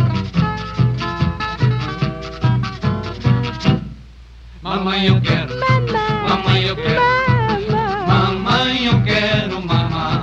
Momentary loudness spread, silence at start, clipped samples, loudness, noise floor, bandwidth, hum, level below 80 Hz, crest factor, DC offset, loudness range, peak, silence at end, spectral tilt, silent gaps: 7 LU; 0 s; under 0.1%; -17 LUFS; -39 dBFS; 7.4 kHz; none; -34 dBFS; 16 dB; under 0.1%; 4 LU; -2 dBFS; 0 s; -7 dB/octave; none